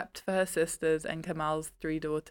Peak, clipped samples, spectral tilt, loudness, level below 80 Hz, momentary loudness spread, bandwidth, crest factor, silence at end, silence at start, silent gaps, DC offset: -16 dBFS; under 0.1%; -4.5 dB/octave; -32 LUFS; -58 dBFS; 6 LU; 18 kHz; 16 dB; 0 s; 0 s; none; under 0.1%